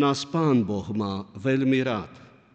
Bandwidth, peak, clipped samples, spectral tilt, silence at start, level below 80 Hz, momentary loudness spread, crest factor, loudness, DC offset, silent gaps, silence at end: 8.6 kHz; -12 dBFS; under 0.1%; -6.5 dB/octave; 0 s; -62 dBFS; 9 LU; 14 dB; -25 LUFS; under 0.1%; none; 0.35 s